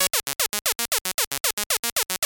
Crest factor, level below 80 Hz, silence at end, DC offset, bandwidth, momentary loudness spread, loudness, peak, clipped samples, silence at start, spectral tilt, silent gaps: 24 dB; -58 dBFS; 0 s; under 0.1%; over 20 kHz; 2 LU; -23 LUFS; -2 dBFS; under 0.1%; 0 s; 1 dB/octave; 1.01-1.05 s, 1.14-1.18 s, 1.27-1.31 s, 1.40-1.44 s, 1.53-1.57 s, 1.66-1.70 s, 1.79-1.83 s, 1.92-1.96 s